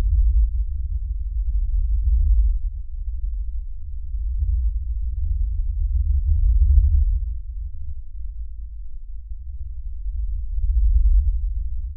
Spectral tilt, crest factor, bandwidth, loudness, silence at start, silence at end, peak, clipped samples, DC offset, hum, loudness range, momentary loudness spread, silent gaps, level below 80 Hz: -26 dB/octave; 16 dB; 0.2 kHz; -25 LUFS; 0 s; 0 s; -4 dBFS; under 0.1%; under 0.1%; none; 7 LU; 16 LU; none; -20 dBFS